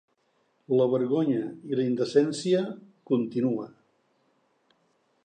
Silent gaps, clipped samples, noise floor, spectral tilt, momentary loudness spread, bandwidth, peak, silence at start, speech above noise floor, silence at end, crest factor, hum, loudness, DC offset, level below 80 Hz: none; under 0.1%; -71 dBFS; -6.5 dB/octave; 10 LU; 9.6 kHz; -8 dBFS; 0.7 s; 45 dB; 1.55 s; 20 dB; none; -27 LUFS; under 0.1%; -80 dBFS